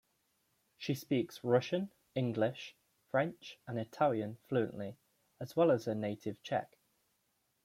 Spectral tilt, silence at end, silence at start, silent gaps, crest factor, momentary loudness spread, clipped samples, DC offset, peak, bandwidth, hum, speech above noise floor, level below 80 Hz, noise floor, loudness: -7 dB/octave; 1 s; 0.8 s; none; 20 dB; 14 LU; under 0.1%; under 0.1%; -16 dBFS; 16 kHz; none; 44 dB; -78 dBFS; -79 dBFS; -36 LUFS